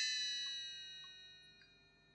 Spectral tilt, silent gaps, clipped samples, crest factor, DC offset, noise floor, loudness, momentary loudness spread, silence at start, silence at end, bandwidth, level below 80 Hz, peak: 2.5 dB/octave; none; under 0.1%; 18 dB; under 0.1%; -69 dBFS; -42 LUFS; 23 LU; 0 s; 0.05 s; 9.6 kHz; -82 dBFS; -28 dBFS